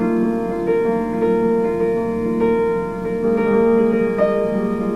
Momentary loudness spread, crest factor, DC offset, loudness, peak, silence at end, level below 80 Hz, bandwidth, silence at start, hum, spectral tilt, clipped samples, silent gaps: 5 LU; 12 dB; 0.5%; -18 LUFS; -4 dBFS; 0 s; -44 dBFS; 10 kHz; 0 s; none; -8.5 dB/octave; under 0.1%; none